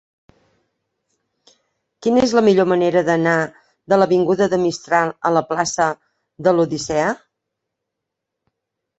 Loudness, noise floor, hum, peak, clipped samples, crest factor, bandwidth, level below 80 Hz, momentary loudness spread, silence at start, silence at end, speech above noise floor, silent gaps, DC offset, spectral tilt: -17 LUFS; -81 dBFS; none; -2 dBFS; under 0.1%; 18 dB; 8.2 kHz; -56 dBFS; 7 LU; 2 s; 1.85 s; 64 dB; none; under 0.1%; -5 dB/octave